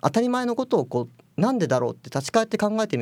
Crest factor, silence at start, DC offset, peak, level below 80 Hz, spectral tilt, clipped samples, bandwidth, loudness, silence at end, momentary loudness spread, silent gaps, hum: 18 dB; 0.05 s; under 0.1%; -4 dBFS; -68 dBFS; -6 dB/octave; under 0.1%; 15.5 kHz; -24 LUFS; 0 s; 7 LU; none; none